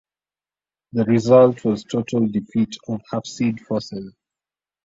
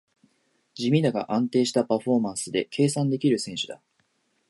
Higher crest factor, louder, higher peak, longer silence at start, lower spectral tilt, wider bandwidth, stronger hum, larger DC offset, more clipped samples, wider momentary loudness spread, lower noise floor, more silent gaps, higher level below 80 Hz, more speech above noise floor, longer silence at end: about the same, 18 dB vs 16 dB; first, -20 LUFS vs -25 LUFS; first, -2 dBFS vs -8 dBFS; first, 0.95 s vs 0.75 s; first, -7 dB/octave vs -5.5 dB/octave; second, 7.8 kHz vs 11.5 kHz; neither; neither; neither; first, 16 LU vs 9 LU; first, under -90 dBFS vs -70 dBFS; neither; first, -58 dBFS vs -70 dBFS; first, over 71 dB vs 46 dB; about the same, 0.75 s vs 0.75 s